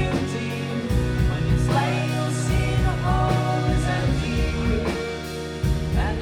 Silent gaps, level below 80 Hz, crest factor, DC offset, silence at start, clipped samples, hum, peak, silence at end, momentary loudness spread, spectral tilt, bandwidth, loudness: none; -28 dBFS; 14 dB; under 0.1%; 0 s; under 0.1%; none; -8 dBFS; 0 s; 6 LU; -6.5 dB/octave; 16 kHz; -23 LUFS